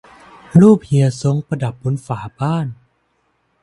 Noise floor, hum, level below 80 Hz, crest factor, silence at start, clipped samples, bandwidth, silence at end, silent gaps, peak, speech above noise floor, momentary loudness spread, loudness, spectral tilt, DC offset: -64 dBFS; none; -50 dBFS; 16 dB; 0.55 s; under 0.1%; 11.5 kHz; 0.9 s; none; 0 dBFS; 49 dB; 13 LU; -16 LUFS; -8.5 dB/octave; under 0.1%